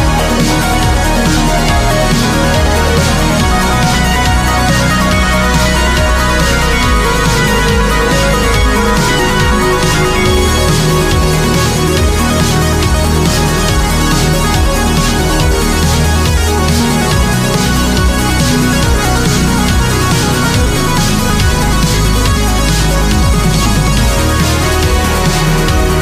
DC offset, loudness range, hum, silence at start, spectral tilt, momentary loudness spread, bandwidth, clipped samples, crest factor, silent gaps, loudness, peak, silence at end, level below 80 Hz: under 0.1%; 1 LU; none; 0 s; -4.5 dB/octave; 1 LU; 15.5 kHz; under 0.1%; 10 dB; none; -11 LUFS; 0 dBFS; 0 s; -16 dBFS